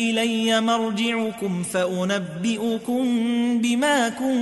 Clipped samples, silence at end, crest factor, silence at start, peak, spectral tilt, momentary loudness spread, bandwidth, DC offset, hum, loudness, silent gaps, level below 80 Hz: under 0.1%; 0 s; 12 dB; 0 s; -10 dBFS; -4.5 dB/octave; 5 LU; 12 kHz; under 0.1%; none; -22 LUFS; none; -66 dBFS